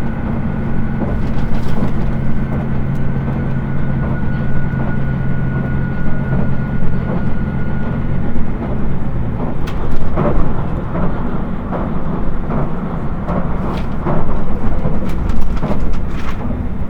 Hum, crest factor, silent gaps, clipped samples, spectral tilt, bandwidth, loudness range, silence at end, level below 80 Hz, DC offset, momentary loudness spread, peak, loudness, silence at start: none; 12 dB; none; 0.1%; -9.5 dB/octave; 3.8 kHz; 2 LU; 0 s; -20 dBFS; under 0.1%; 3 LU; 0 dBFS; -20 LUFS; 0 s